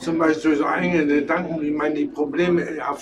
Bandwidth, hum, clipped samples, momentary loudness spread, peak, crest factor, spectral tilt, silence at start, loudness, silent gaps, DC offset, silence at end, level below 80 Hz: 10 kHz; none; under 0.1%; 5 LU; -6 dBFS; 16 dB; -6.5 dB/octave; 0 s; -21 LUFS; none; under 0.1%; 0 s; -54 dBFS